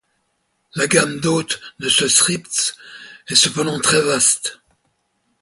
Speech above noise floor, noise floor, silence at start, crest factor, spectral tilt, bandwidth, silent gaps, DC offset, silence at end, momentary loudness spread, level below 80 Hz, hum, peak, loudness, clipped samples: 51 dB; -69 dBFS; 0.75 s; 20 dB; -2 dB/octave; 12 kHz; none; under 0.1%; 0.85 s; 14 LU; -58 dBFS; none; 0 dBFS; -16 LUFS; under 0.1%